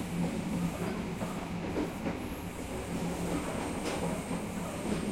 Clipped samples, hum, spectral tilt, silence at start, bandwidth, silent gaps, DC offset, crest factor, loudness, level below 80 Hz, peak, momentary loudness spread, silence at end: under 0.1%; none; -5.5 dB/octave; 0 s; 16.5 kHz; none; under 0.1%; 14 dB; -35 LUFS; -48 dBFS; -20 dBFS; 4 LU; 0 s